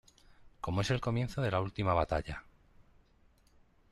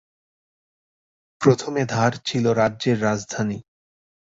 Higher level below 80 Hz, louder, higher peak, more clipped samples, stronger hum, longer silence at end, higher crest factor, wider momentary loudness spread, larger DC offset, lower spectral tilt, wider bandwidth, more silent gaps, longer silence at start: first, -52 dBFS vs -58 dBFS; second, -34 LUFS vs -22 LUFS; second, -16 dBFS vs -2 dBFS; neither; neither; first, 1.1 s vs 0.75 s; about the same, 20 dB vs 22 dB; first, 12 LU vs 7 LU; neither; about the same, -6.5 dB/octave vs -5.5 dB/octave; first, 12.5 kHz vs 8 kHz; neither; second, 0.45 s vs 1.4 s